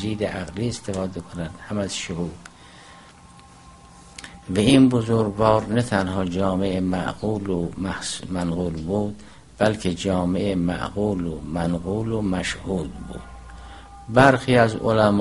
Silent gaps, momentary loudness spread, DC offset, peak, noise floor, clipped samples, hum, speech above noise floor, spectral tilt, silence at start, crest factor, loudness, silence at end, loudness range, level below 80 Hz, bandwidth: none; 20 LU; 0.2%; 0 dBFS; -47 dBFS; under 0.1%; none; 25 dB; -6 dB/octave; 0 s; 22 dB; -23 LUFS; 0 s; 10 LU; -44 dBFS; 11.5 kHz